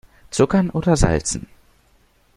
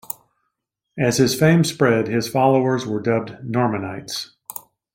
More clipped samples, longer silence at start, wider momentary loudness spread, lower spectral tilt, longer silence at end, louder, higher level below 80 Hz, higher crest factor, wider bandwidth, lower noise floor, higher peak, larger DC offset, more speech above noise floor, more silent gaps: neither; second, 0.35 s vs 0.95 s; second, 10 LU vs 17 LU; about the same, -5.5 dB/octave vs -5.5 dB/octave; first, 0.95 s vs 0.35 s; about the same, -19 LUFS vs -19 LUFS; first, -32 dBFS vs -56 dBFS; about the same, 20 dB vs 18 dB; second, 12 kHz vs 16.5 kHz; second, -58 dBFS vs -77 dBFS; about the same, -2 dBFS vs -2 dBFS; neither; second, 40 dB vs 59 dB; neither